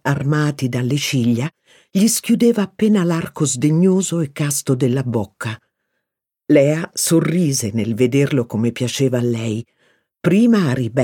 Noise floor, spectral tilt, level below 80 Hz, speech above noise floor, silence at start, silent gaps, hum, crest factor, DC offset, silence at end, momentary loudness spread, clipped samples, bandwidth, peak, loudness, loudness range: -81 dBFS; -5.5 dB/octave; -58 dBFS; 64 dB; 0.05 s; none; none; 16 dB; under 0.1%; 0 s; 8 LU; under 0.1%; 18.5 kHz; 0 dBFS; -17 LUFS; 2 LU